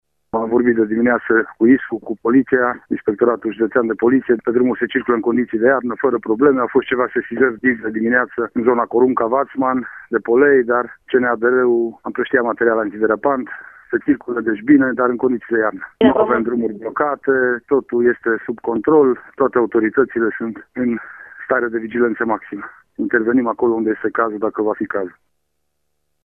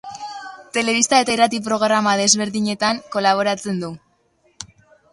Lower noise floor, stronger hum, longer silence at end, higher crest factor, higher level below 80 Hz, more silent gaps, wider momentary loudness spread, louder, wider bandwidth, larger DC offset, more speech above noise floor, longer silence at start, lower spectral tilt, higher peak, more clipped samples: first, -74 dBFS vs -61 dBFS; neither; first, 1.15 s vs 0.45 s; about the same, 16 dB vs 20 dB; first, -56 dBFS vs -62 dBFS; neither; second, 8 LU vs 19 LU; about the same, -17 LUFS vs -18 LUFS; second, 3.6 kHz vs 11.5 kHz; neither; first, 57 dB vs 43 dB; first, 0.35 s vs 0.05 s; first, -9.5 dB/octave vs -2.5 dB/octave; about the same, 0 dBFS vs 0 dBFS; neither